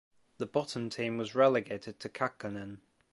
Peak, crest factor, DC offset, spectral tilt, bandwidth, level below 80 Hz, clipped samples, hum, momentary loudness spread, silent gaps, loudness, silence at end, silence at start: -12 dBFS; 22 dB; under 0.1%; -5.5 dB/octave; 11.5 kHz; -70 dBFS; under 0.1%; none; 15 LU; none; -33 LUFS; 0.35 s; 0.4 s